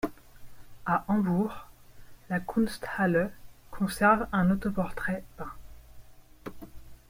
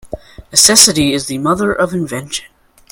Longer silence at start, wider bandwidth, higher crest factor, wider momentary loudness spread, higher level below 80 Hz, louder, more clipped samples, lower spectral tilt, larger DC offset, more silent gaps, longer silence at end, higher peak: about the same, 0.05 s vs 0.05 s; second, 16.5 kHz vs over 20 kHz; first, 22 dB vs 14 dB; first, 22 LU vs 18 LU; second, -50 dBFS vs -42 dBFS; second, -29 LUFS vs -11 LUFS; second, under 0.1% vs 0.5%; first, -7 dB/octave vs -2 dB/octave; neither; neither; second, 0.15 s vs 0.5 s; second, -8 dBFS vs 0 dBFS